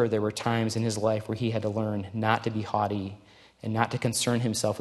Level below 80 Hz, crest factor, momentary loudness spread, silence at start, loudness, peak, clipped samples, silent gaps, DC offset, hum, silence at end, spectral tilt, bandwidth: -64 dBFS; 20 dB; 5 LU; 0 s; -28 LUFS; -8 dBFS; under 0.1%; none; under 0.1%; none; 0 s; -5 dB/octave; 12.5 kHz